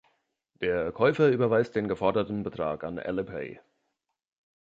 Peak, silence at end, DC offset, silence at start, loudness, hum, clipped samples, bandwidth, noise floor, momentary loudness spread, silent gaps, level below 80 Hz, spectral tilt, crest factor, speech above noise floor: -10 dBFS; 1.05 s; under 0.1%; 0.6 s; -27 LUFS; none; under 0.1%; 7.6 kHz; -80 dBFS; 11 LU; none; -58 dBFS; -8 dB/octave; 18 dB; 53 dB